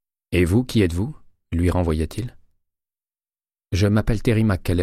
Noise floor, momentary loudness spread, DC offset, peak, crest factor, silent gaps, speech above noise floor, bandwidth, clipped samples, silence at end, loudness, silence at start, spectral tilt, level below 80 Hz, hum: under -90 dBFS; 10 LU; under 0.1%; -6 dBFS; 16 dB; none; over 71 dB; 15 kHz; under 0.1%; 0 s; -21 LUFS; 0.3 s; -7 dB/octave; -34 dBFS; none